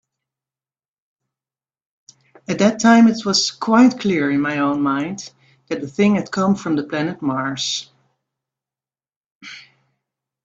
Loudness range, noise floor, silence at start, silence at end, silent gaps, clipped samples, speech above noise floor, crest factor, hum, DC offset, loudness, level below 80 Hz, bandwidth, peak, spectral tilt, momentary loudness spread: 9 LU; under -90 dBFS; 2.5 s; 0.85 s; 9.16-9.41 s; under 0.1%; over 73 dB; 20 dB; none; under 0.1%; -18 LUFS; -62 dBFS; 8 kHz; 0 dBFS; -4.5 dB/octave; 17 LU